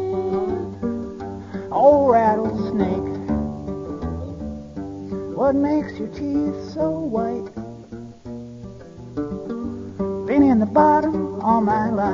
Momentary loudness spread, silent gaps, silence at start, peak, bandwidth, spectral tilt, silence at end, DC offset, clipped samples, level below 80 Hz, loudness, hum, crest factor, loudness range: 20 LU; none; 0 s; -2 dBFS; 7.4 kHz; -9 dB/octave; 0 s; under 0.1%; under 0.1%; -44 dBFS; -21 LUFS; none; 18 dB; 8 LU